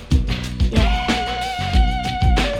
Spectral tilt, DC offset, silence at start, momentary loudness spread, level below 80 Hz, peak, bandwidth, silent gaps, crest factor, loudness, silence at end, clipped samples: -5.5 dB/octave; under 0.1%; 0 s; 5 LU; -20 dBFS; -2 dBFS; 12 kHz; none; 16 dB; -20 LUFS; 0 s; under 0.1%